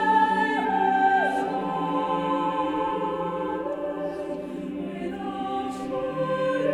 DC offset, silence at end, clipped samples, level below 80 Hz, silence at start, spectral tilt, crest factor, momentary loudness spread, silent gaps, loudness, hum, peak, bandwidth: under 0.1%; 0 s; under 0.1%; -58 dBFS; 0 s; -6 dB/octave; 16 dB; 11 LU; none; -26 LUFS; none; -10 dBFS; 12 kHz